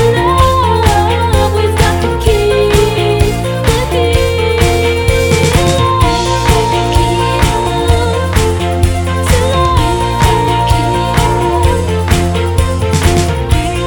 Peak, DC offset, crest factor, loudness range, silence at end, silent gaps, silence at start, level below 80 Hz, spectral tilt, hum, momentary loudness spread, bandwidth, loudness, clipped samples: 0 dBFS; under 0.1%; 10 dB; 1 LU; 0 s; none; 0 s; -18 dBFS; -5.5 dB/octave; none; 3 LU; 19 kHz; -11 LUFS; under 0.1%